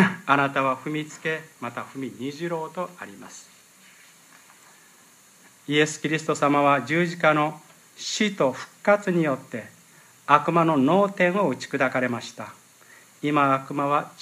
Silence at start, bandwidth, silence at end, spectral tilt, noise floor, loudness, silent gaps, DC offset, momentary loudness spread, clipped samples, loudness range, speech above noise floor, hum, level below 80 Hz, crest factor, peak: 0 s; 15.5 kHz; 0.1 s; -5 dB/octave; -54 dBFS; -23 LUFS; none; under 0.1%; 17 LU; under 0.1%; 12 LU; 30 dB; none; -76 dBFS; 24 dB; 0 dBFS